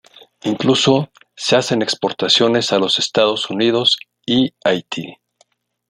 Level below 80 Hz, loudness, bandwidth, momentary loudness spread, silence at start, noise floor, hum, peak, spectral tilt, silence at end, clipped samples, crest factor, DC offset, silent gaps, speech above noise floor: -58 dBFS; -16 LUFS; 13 kHz; 11 LU; 0.45 s; -60 dBFS; none; 0 dBFS; -4 dB/octave; 0.75 s; under 0.1%; 18 dB; under 0.1%; none; 43 dB